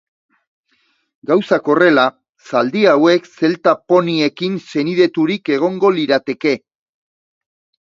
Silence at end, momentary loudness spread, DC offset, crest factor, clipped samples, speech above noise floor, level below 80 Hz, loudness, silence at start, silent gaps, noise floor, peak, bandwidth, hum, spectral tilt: 1.25 s; 8 LU; under 0.1%; 16 dB; under 0.1%; 48 dB; -66 dBFS; -15 LUFS; 1.3 s; 2.29-2.33 s; -62 dBFS; 0 dBFS; 7.4 kHz; none; -6 dB/octave